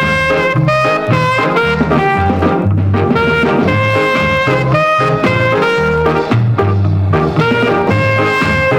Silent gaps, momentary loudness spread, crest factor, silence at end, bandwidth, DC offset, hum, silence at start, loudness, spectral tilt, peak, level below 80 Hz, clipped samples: none; 1 LU; 12 dB; 0 s; 15.5 kHz; under 0.1%; none; 0 s; -12 LUFS; -7 dB/octave; 0 dBFS; -36 dBFS; under 0.1%